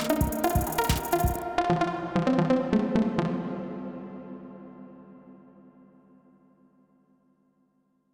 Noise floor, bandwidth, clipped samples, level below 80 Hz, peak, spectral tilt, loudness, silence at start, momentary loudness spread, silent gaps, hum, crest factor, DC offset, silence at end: -70 dBFS; over 20 kHz; under 0.1%; -42 dBFS; -10 dBFS; -6 dB/octave; -27 LUFS; 0 s; 21 LU; none; 50 Hz at -60 dBFS; 20 dB; under 0.1%; 2.75 s